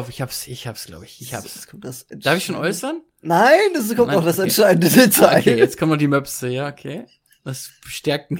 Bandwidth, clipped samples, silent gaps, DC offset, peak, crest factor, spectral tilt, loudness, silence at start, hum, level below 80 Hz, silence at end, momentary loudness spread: 17 kHz; under 0.1%; none; under 0.1%; 0 dBFS; 18 dB; -4.5 dB/octave; -16 LUFS; 0 s; none; -56 dBFS; 0 s; 22 LU